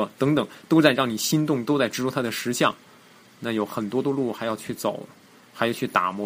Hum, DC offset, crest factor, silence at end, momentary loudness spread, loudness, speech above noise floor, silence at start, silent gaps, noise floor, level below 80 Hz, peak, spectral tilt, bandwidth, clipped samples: none; under 0.1%; 24 dB; 0 s; 10 LU; -24 LUFS; 28 dB; 0 s; none; -52 dBFS; -66 dBFS; -2 dBFS; -4.5 dB/octave; 15.5 kHz; under 0.1%